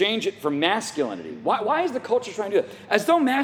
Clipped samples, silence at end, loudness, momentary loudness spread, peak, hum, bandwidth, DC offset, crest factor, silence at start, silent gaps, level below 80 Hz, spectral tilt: under 0.1%; 0 s; -24 LUFS; 7 LU; -2 dBFS; none; 19 kHz; under 0.1%; 20 dB; 0 s; none; -74 dBFS; -3.5 dB/octave